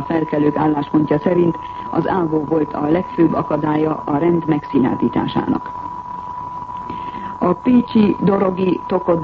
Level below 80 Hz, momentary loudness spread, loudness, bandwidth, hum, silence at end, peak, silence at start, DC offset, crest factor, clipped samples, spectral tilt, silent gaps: -46 dBFS; 13 LU; -18 LUFS; 5.8 kHz; none; 0 s; -2 dBFS; 0 s; under 0.1%; 14 dB; under 0.1%; -9.5 dB/octave; none